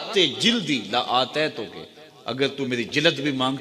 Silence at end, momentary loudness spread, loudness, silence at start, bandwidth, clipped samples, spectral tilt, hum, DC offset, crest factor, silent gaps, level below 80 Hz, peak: 0 s; 15 LU; -22 LUFS; 0 s; 15 kHz; under 0.1%; -4 dB/octave; none; under 0.1%; 22 dB; none; -66 dBFS; -2 dBFS